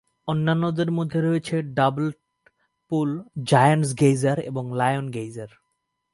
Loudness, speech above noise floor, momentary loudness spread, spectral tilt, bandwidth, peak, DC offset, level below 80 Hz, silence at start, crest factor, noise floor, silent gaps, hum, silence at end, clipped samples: -23 LUFS; 54 dB; 12 LU; -6.5 dB/octave; 11.5 kHz; -4 dBFS; under 0.1%; -62 dBFS; 0.25 s; 20 dB; -76 dBFS; none; none; 0.65 s; under 0.1%